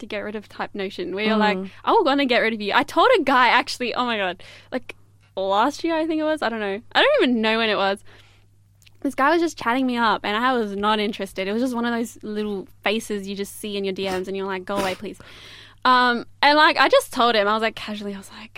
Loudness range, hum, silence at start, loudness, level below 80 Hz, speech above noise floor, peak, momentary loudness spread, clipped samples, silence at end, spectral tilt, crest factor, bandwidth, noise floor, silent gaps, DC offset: 7 LU; none; 0 s; -21 LUFS; -56 dBFS; 33 dB; -2 dBFS; 15 LU; under 0.1%; 0.1 s; -4 dB/octave; 20 dB; 16 kHz; -54 dBFS; none; under 0.1%